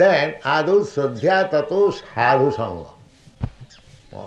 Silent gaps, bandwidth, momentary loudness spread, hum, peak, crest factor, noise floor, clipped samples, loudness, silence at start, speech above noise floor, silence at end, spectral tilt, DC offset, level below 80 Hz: none; 8.4 kHz; 16 LU; none; -4 dBFS; 16 dB; -46 dBFS; under 0.1%; -19 LUFS; 0 s; 28 dB; 0 s; -6 dB/octave; under 0.1%; -48 dBFS